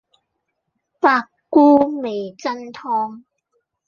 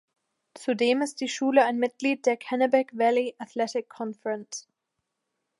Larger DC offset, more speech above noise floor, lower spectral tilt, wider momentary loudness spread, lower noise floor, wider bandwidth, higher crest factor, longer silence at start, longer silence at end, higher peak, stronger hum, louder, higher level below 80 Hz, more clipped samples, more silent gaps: neither; about the same, 58 dB vs 56 dB; first, -5.5 dB/octave vs -3.5 dB/octave; about the same, 14 LU vs 12 LU; second, -75 dBFS vs -82 dBFS; second, 7 kHz vs 11.5 kHz; about the same, 18 dB vs 20 dB; first, 1.05 s vs 0.55 s; second, 0.7 s vs 1 s; first, -2 dBFS vs -8 dBFS; neither; first, -18 LUFS vs -26 LUFS; first, -64 dBFS vs -84 dBFS; neither; neither